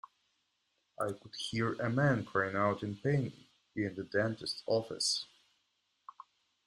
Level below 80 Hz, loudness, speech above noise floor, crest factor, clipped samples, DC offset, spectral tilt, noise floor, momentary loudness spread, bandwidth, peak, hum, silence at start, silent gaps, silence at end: -70 dBFS; -34 LUFS; 46 dB; 20 dB; under 0.1%; under 0.1%; -4.5 dB/octave; -80 dBFS; 11 LU; 13.5 kHz; -16 dBFS; none; 1 s; none; 1.4 s